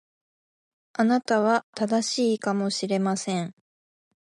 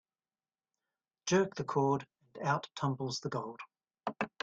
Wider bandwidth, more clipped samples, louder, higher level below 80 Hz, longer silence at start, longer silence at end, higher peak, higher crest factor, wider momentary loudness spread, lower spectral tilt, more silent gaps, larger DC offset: first, 11.5 kHz vs 9 kHz; neither; first, -25 LUFS vs -35 LUFS; about the same, -76 dBFS vs -74 dBFS; second, 1 s vs 1.25 s; first, 0.75 s vs 0.15 s; first, -10 dBFS vs -18 dBFS; about the same, 16 dB vs 20 dB; second, 8 LU vs 14 LU; about the same, -4.5 dB/octave vs -5 dB/octave; first, 1.64-1.73 s vs none; neither